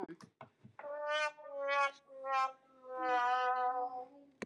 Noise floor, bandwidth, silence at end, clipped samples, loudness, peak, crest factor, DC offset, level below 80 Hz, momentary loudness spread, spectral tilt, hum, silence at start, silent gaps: -59 dBFS; 10.5 kHz; 0 s; under 0.1%; -36 LUFS; -22 dBFS; 16 dB; under 0.1%; under -90 dBFS; 17 LU; -2.5 dB/octave; none; 0 s; none